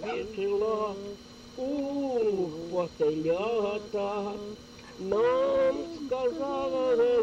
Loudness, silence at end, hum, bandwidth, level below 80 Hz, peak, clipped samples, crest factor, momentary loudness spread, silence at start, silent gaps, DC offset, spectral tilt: -29 LUFS; 0 s; none; 9 kHz; -60 dBFS; -16 dBFS; under 0.1%; 14 dB; 15 LU; 0 s; none; under 0.1%; -6 dB/octave